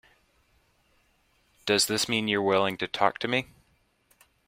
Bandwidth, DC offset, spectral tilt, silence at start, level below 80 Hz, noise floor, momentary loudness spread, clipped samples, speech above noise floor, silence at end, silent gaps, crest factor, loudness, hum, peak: 16 kHz; under 0.1%; -3 dB/octave; 1.65 s; -66 dBFS; -68 dBFS; 6 LU; under 0.1%; 42 dB; 1 s; none; 24 dB; -26 LUFS; none; -6 dBFS